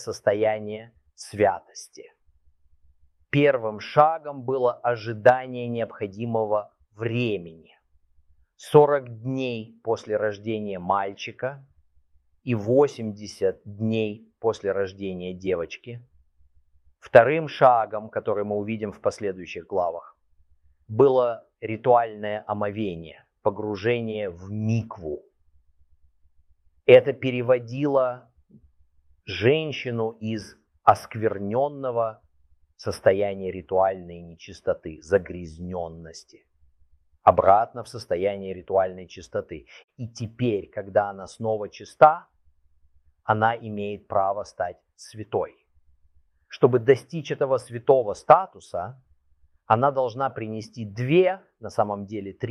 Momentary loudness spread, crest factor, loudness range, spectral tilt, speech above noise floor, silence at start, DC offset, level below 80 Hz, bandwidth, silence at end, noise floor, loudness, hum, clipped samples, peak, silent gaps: 18 LU; 24 dB; 6 LU; -6.5 dB/octave; 38 dB; 0 s; under 0.1%; -60 dBFS; 12 kHz; 0 s; -62 dBFS; -24 LUFS; none; under 0.1%; -2 dBFS; 39.84-39.88 s